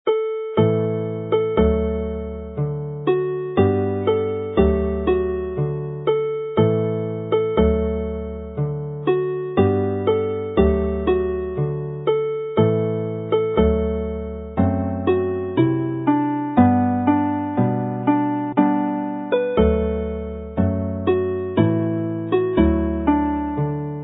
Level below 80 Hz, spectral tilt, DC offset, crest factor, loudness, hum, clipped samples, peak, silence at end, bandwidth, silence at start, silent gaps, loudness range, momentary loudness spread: -32 dBFS; -13 dB/octave; under 0.1%; 18 dB; -21 LUFS; none; under 0.1%; -2 dBFS; 0 s; 4 kHz; 0.05 s; none; 2 LU; 7 LU